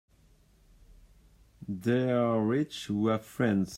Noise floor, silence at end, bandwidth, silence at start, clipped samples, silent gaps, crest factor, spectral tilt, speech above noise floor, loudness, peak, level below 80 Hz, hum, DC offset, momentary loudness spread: -62 dBFS; 0 s; 16 kHz; 0.9 s; under 0.1%; none; 16 dB; -7 dB/octave; 34 dB; -29 LUFS; -14 dBFS; -62 dBFS; none; under 0.1%; 7 LU